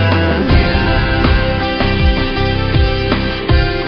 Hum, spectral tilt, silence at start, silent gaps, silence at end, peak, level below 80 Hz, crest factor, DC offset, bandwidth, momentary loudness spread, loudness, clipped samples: none; -4.5 dB/octave; 0 s; none; 0 s; 0 dBFS; -18 dBFS; 12 dB; under 0.1%; 6.2 kHz; 3 LU; -14 LUFS; under 0.1%